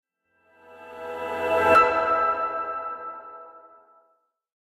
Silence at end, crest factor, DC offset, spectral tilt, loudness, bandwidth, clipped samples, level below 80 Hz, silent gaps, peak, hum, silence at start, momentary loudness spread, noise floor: 1.05 s; 20 dB; under 0.1%; -4.5 dB/octave; -22 LUFS; 16 kHz; under 0.1%; -58 dBFS; none; -6 dBFS; none; 0.7 s; 24 LU; -68 dBFS